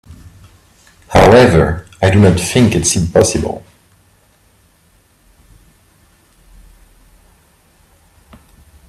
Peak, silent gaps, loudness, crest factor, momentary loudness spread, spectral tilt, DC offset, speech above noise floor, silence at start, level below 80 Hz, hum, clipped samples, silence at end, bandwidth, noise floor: 0 dBFS; none; -11 LUFS; 16 dB; 11 LU; -5 dB/octave; under 0.1%; 43 dB; 1.1 s; -34 dBFS; none; under 0.1%; 5.3 s; 15 kHz; -53 dBFS